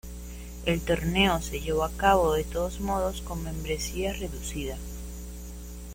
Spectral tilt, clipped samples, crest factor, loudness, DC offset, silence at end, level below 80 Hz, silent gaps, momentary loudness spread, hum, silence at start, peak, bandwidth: -4.5 dB/octave; under 0.1%; 20 dB; -28 LUFS; under 0.1%; 0 s; -38 dBFS; none; 18 LU; 60 Hz at -35 dBFS; 0.05 s; -8 dBFS; 16.5 kHz